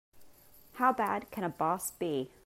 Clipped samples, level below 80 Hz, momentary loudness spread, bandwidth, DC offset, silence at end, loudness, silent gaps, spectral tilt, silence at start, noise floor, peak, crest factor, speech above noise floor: under 0.1%; -70 dBFS; 8 LU; 16 kHz; under 0.1%; 0.2 s; -32 LUFS; none; -4.5 dB/octave; 0.15 s; -57 dBFS; -14 dBFS; 20 dB; 23 dB